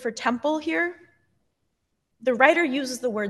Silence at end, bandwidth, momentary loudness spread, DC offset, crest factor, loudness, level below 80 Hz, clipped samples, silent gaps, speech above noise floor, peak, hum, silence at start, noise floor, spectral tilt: 0 s; 12.5 kHz; 10 LU; under 0.1%; 24 dB; -23 LUFS; -76 dBFS; under 0.1%; none; 52 dB; -2 dBFS; none; 0 s; -75 dBFS; -3.5 dB/octave